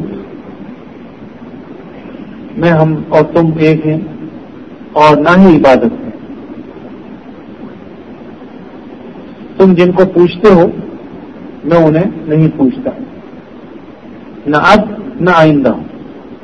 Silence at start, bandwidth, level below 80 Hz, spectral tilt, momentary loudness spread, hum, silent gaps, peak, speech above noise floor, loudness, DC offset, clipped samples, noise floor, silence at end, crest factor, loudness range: 0 s; 8.4 kHz; -40 dBFS; -8 dB/octave; 24 LU; none; none; 0 dBFS; 23 dB; -9 LUFS; 0.5%; 1%; -31 dBFS; 0.05 s; 12 dB; 7 LU